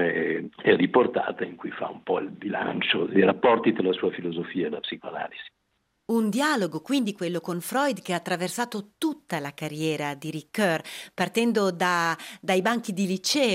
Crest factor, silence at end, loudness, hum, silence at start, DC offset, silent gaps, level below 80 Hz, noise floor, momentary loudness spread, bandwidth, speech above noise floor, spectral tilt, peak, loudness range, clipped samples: 20 dB; 0 s; -26 LUFS; none; 0 s; under 0.1%; none; -72 dBFS; -74 dBFS; 12 LU; 16 kHz; 48 dB; -4.5 dB/octave; -6 dBFS; 4 LU; under 0.1%